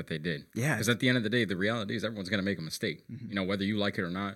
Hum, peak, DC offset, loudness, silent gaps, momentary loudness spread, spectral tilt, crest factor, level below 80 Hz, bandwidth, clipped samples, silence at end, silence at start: none; -10 dBFS; under 0.1%; -31 LUFS; none; 8 LU; -5 dB/octave; 20 dB; -68 dBFS; 16.5 kHz; under 0.1%; 0 s; 0 s